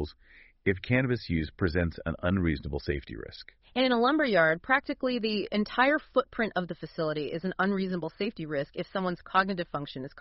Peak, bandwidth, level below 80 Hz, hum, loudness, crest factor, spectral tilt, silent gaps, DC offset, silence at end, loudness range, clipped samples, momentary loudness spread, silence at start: -8 dBFS; 5.8 kHz; -48 dBFS; none; -29 LUFS; 20 dB; -4 dB/octave; none; under 0.1%; 0 s; 4 LU; under 0.1%; 11 LU; 0 s